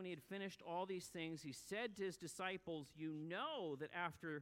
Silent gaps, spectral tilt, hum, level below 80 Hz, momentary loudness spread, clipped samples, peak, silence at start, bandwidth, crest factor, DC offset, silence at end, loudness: none; -4.5 dB/octave; none; -82 dBFS; 4 LU; under 0.1%; -30 dBFS; 0 s; 16.5 kHz; 18 dB; under 0.1%; 0 s; -48 LUFS